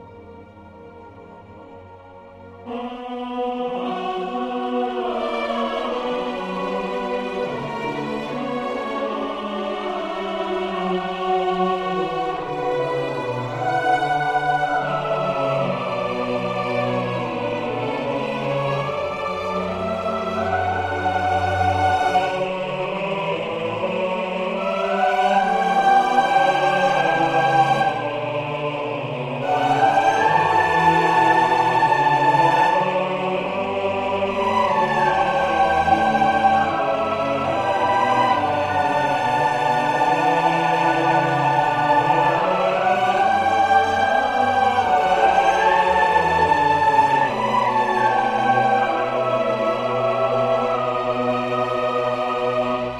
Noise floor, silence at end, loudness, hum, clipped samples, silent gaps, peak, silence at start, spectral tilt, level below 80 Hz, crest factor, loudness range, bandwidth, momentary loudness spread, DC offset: -42 dBFS; 0 s; -20 LUFS; none; under 0.1%; none; -2 dBFS; 0 s; -5.5 dB/octave; -52 dBFS; 18 dB; 8 LU; 12.5 kHz; 9 LU; under 0.1%